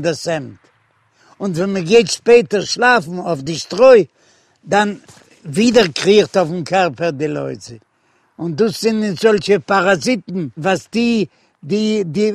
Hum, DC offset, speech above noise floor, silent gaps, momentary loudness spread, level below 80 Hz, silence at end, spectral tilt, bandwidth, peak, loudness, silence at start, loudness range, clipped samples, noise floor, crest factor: none; under 0.1%; 44 dB; none; 13 LU; -56 dBFS; 0 s; -4.5 dB/octave; 13.5 kHz; 0 dBFS; -15 LUFS; 0 s; 4 LU; under 0.1%; -59 dBFS; 16 dB